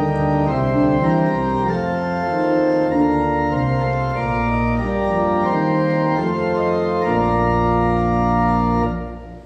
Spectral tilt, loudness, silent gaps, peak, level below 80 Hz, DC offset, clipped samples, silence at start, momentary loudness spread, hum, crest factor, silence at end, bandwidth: -9 dB/octave; -19 LUFS; none; -4 dBFS; -32 dBFS; under 0.1%; under 0.1%; 0 s; 4 LU; none; 14 dB; 0 s; 8.4 kHz